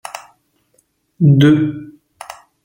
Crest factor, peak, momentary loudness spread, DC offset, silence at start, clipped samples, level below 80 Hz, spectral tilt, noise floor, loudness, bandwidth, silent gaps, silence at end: 16 dB; -2 dBFS; 25 LU; under 0.1%; 0.15 s; under 0.1%; -54 dBFS; -7.5 dB/octave; -61 dBFS; -13 LUFS; 15.5 kHz; none; 0.75 s